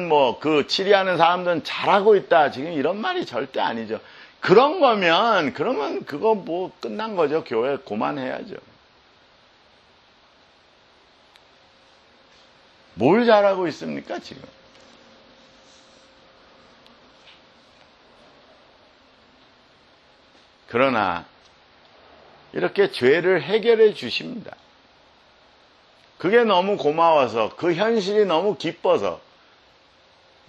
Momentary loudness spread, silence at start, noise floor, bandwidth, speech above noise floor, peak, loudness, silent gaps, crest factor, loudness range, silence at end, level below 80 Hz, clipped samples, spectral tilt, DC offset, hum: 14 LU; 0 s; -55 dBFS; 10 kHz; 35 dB; -2 dBFS; -20 LUFS; none; 22 dB; 9 LU; 1.3 s; -68 dBFS; under 0.1%; -5.5 dB/octave; under 0.1%; none